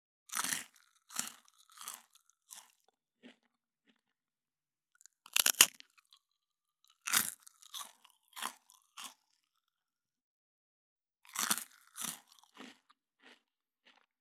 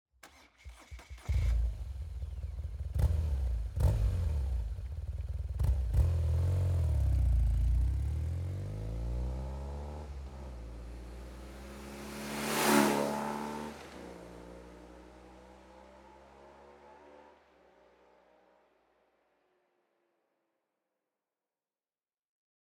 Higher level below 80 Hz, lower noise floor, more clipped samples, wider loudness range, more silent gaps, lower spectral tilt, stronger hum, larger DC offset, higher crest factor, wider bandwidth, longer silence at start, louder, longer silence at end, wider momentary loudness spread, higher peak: second, under -90 dBFS vs -38 dBFS; about the same, under -90 dBFS vs under -90 dBFS; neither; first, 19 LU vs 13 LU; first, 10.24-10.96 s vs none; second, 1.5 dB/octave vs -6 dB/octave; neither; neither; first, 40 dB vs 22 dB; about the same, 19.5 kHz vs 19 kHz; about the same, 0.3 s vs 0.25 s; about the same, -33 LUFS vs -34 LUFS; second, 1.5 s vs 5.5 s; first, 27 LU vs 22 LU; first, 0 dBFS vs -14 dBFS